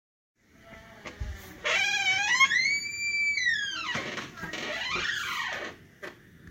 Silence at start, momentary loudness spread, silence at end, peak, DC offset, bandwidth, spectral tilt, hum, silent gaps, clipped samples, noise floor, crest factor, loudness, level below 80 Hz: 0.65 s; 22 LU; 0 s; -10 dBFS; under 0.1%; 16 kHz; -1 dB/octave; none; none; under 0.1%; -52 dBFS; 20 dB; -27 LUFS; -52 dBFS